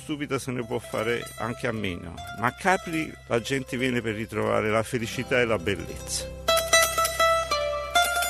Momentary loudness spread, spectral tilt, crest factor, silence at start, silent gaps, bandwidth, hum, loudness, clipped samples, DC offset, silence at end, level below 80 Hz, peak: 10 LU; -3 dB/octave; 20 dB; 0 s; none; 15 kHz; none; -26 LUFS; under 0.1%; under 0.1%; 0 s; -46 dBFS; -6 dBFS